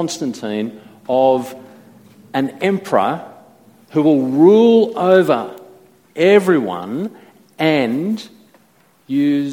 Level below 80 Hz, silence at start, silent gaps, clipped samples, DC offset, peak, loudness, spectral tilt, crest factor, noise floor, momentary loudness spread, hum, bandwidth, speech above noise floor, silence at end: -64 dBFS; 0 s; none; under 0.1%; under 0.1%; 0 dBFS; -16 LUFS; -6 dB/octave; 16 dB; -54 dBFS; 15 LU; none; 17.5 kHz; 39 dB; 0 s